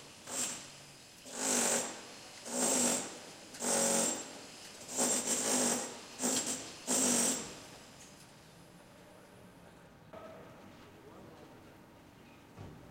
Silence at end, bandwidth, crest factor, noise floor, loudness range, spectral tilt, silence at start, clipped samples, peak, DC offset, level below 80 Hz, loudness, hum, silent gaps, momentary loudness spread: 0 s; 16 kHz; 22 dB; -57 dBFS; 22 LU; -1.5 dB/octave; 0 s; under 0.1%; -16 dBFS; under 0.1%; -72 dBFS; -32 LUFS; none; none; 25 LU